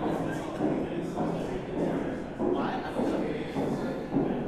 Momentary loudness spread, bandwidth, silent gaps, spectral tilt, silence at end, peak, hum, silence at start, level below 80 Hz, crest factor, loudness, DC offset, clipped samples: 3 LU; 13.5 kHz; none; -7.5 dB/octave; 0 s; -16 dBFS; none; 0 s; -50 dBFS; 16 dB; -31 LUFS; under 0.1%; under 0.1%